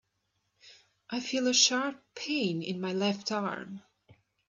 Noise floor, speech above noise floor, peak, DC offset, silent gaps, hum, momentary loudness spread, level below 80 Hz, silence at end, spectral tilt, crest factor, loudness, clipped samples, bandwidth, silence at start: -79 dBFS; 48 dB; -10 dBFS; under 0.1%; none; none; 17 LU; -80 dBFS; 0.7 s; -2.5 dB/octave; 22 dB; -29 LUFS; under 0.1%; 7.8 kHz; 0.65 s